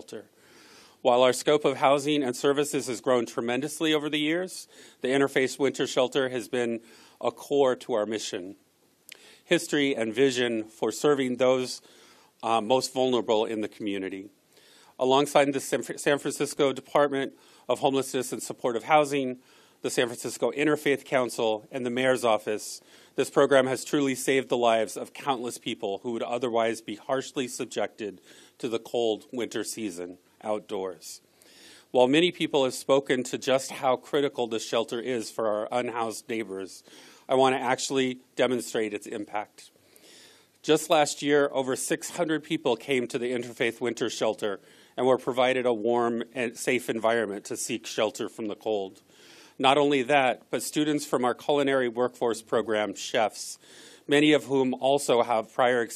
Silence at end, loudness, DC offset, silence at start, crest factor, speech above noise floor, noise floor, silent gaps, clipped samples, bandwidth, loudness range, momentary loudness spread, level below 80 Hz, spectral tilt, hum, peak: 0 s; -27 LUFS; under 0.1%; 0.1 s; 22 dB; 31 dB; -57 dBFS; none; under 0.1%; 14 kHz; 5 LU; 11 LU; -78 dBFS; -4 dB/octave; none; -6 dBFS